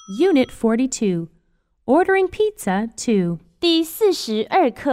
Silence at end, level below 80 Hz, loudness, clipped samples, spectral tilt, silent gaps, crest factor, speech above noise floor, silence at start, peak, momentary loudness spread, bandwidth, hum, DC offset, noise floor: 0 s; -52 dBFS; -19 LUFS; under 0.1%; -5 dB/octave; none; 16 dB; 45 dB; 0.1 s; -4 dBFS; 6 LU; 16 kHz; none; under 0.1%; -64 dBFS